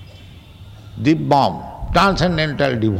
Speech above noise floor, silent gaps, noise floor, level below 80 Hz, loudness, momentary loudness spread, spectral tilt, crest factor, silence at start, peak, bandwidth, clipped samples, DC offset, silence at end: 24 dB; none; -40 dBFS; -34 dBFS; -17 LUFS; 7 LU; -6.5 dB/octave; 16 dB; 0 s; -4 dBFS; 16 kHz; under 0.1%; under 0.1%; 0 s